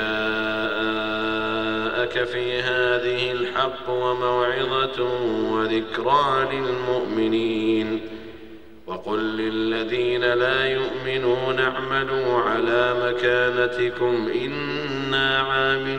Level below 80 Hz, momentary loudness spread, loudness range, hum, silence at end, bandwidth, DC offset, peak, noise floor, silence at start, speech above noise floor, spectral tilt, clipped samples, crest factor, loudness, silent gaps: -52 dBFS; 6 LU; 3 LU; none; 0 s; 9 kHz; 0.6%; -6 dBFS; -44 dBFS; 0 s; 21 dB; -6 dB/octave; under 0.1%; 18 dB; -22 LUFS; none